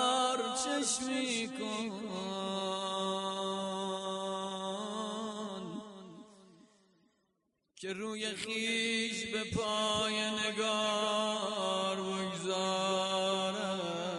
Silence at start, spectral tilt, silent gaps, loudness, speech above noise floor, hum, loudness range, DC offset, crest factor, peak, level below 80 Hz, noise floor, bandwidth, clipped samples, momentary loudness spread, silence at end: 0 s; -3 dB/octave; none; -34 LUFS; 45 dB; none; 10 LU; under 0.1%; 18 dB; -18 dBFS; -72 dBFS; -80 dBFS; 11.5 kHz; under 0.1%; 8 LU; 0 s